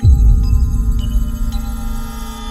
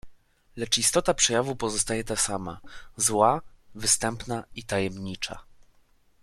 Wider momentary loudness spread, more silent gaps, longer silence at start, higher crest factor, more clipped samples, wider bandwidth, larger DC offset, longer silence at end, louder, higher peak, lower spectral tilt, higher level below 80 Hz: about the same, 13 LU vs 14 LU; neither; about the same, 0 s vs 0.05 s; second, 14 dB vs 22 dB; neither; second, 14 kHz vs 15.5 kHz; neither; second, 0 s vs 0.7 s; first, -18 LUFS vs -25 LUFS; first, 0 dBFS vs -6 dBFS; first, -7 dB/octave vs -2.5 dB/octave; first, -14 dBFS vs -50 dBFS